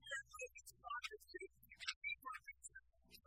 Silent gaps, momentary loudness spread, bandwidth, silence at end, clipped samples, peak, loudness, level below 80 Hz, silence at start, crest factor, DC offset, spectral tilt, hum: 1.96-2.01 s; 12 LU; 16 kHz; 0.05 s; under 0.1%; -26 dBFS; -51 LUFS; -78 dBFS; 0 s; 26 dB; under 0.1%; -0.5 dB/octave; none